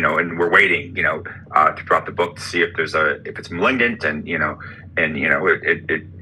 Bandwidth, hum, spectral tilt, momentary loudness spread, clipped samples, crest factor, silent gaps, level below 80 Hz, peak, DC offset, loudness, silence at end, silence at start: 12.5 kHz; none; -5 dB/octave; 9 LU; under 0.1%; 20 dB; none; -54 dBFS; 0 dBFS; under 0.1%; -18 LUFS; 0 s; 0 s